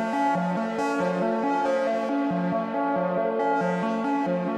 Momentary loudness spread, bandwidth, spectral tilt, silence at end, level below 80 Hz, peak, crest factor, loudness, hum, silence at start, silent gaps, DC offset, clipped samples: 2 LU; 10.5 kHz; -7 dB/octave; 0 s; -70 dBFS; -14 dBFS; 12 dB; -25 LUFS; none; 0 s; none; under 0.1%; under 0.1%